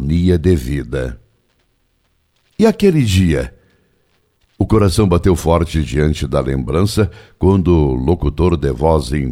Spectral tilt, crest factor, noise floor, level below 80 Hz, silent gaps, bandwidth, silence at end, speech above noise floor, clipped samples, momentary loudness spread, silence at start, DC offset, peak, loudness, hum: -7 dB/octave; 14 dB; -62 dBFS; -26 dBFS; none; 15.5 kHz; 0 s; 48 dB; under 0.1%; 8 LU; 0 s; under 0.1%; 0 dBFS; -15 LUFS; none